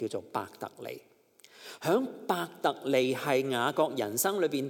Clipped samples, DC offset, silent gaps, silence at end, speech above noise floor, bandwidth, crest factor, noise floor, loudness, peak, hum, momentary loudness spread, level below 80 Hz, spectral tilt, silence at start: under 0.1%; under 0.1%; none; 0 s; 28 dB; 17.5 kHz; 18 dB; -58 dBFS; -30 LUFS; -12 dBFS; none; 15 LU; -86 dBFS; -4 dB/octave; 0 s